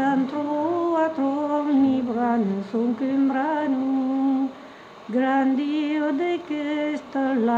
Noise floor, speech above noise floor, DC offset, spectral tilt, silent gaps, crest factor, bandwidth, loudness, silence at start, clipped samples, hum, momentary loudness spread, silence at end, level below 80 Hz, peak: -43 dBFS; 20 dB; under 0.1%; -7 dB/octave; none; 12 dB; 7.4 kHz; -23 LUFS; 0 s; under 0.1%; none; 6 LU; 0 s; -68 dBFS; -10 dBFS